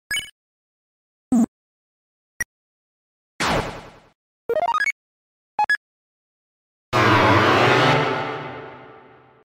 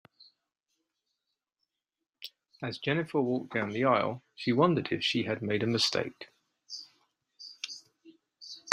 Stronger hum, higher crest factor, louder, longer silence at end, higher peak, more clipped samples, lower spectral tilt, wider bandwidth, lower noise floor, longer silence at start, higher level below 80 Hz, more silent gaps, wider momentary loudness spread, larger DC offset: neither; second, 20 dB vs 30 dB; first, -20 LUFS vs -30 LUFS; first, 0.55 s vs 0 s; about the same, -4 dBFS vs -4 dBFS; neither; about the same, -5 dB/octave vs -5 dB/octave; about the same, 16 kHz vs 15.5 kHz; second, -49 dBFS vs -88 dBFS; about the same, 0.1 s vs 0.2 s; first, -50 dBFS vs -72 dBFS; first, 0.31-1.31 s, 1.48-3.39 s, 4.15-4.49 s, 4.92-5.58 s, 5.77-6.92 s vs none; about the same, 21 LU vs 20 LU; neither